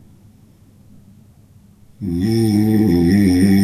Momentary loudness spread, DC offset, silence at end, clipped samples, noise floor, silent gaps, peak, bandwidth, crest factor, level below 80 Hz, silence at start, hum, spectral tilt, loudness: 10 LU; under 0.1%; 0 s; under 0.1%; -48 dBFS; none; -2 dBFS; 13.5 kHz; 14 dB; -46 dBFS; 2 s; none; -7.5 dB/octave; -15 LUFS